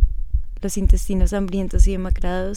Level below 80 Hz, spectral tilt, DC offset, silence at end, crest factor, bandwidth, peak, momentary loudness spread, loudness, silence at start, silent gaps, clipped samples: -20 dBFS; -6.5 dB/octave; under 0.1%; 0 s; 16 dB; 13 kHz; -2 dBFS; 7 LU; -22 LUFS; 0 s; none; under 0.1%